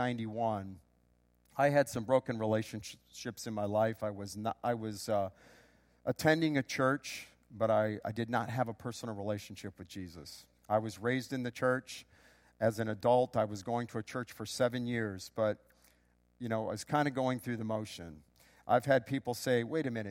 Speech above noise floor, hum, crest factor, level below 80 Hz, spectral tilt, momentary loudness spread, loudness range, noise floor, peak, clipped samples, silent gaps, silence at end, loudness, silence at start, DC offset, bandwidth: 37 dB; 60 Hz at -65 dBFS; 22 dB; -70 dBFS; -5.5 dB/octave; 16 LU; 4 LU; -71 dBFS; -12 dBFS; under 0.1%; none; 0 s; -34 LUFS; 0 s; under 0.1%; 16.5 kHz